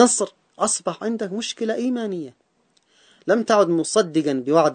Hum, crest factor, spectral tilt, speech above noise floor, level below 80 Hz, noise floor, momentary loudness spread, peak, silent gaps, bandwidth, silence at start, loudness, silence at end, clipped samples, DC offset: none; 20 dB; -3.5 dB/octave; 44 dB; -72 dBFS; -65 dBFS; 12 LU; 0 dBFS; none; 9.4 kHz; 0 s; -22 LUFS; 0 s; under 0.1%; under 0.1%